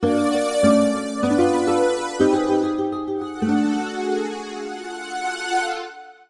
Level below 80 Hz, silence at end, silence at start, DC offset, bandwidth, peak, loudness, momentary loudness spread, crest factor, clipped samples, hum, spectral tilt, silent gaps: -58 dBFS; 0.2 s; 0 s; under 0.1%; 11.5 kHz; -4 dBFS; -21 LUFS; 12 LU; 18 dB; under 0.1%; none; -5 dB/octave; none